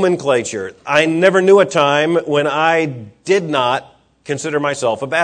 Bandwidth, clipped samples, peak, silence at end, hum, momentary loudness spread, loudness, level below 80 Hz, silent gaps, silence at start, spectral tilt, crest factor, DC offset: 9.4 kHz; under 0.1%; 0 dBFS; 0 s; none; 12 LU; -15 LUFS; -62 dBFS; none; 0 s; -4.5 dB/octave; 16 dB; under 0.1%